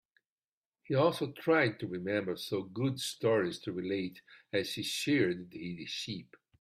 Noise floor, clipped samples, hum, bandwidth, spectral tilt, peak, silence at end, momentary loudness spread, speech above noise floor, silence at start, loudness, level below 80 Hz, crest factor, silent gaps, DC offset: under -90 dBFS; under 0.1%; none; 15.5 kHz; -5 dB/octave; -14 dBFS; 0.35 s; 10 LU; over 57 dB; 0.9 s; -33 LUFS; -74 dBFS; 20 dB; none; under 0.1%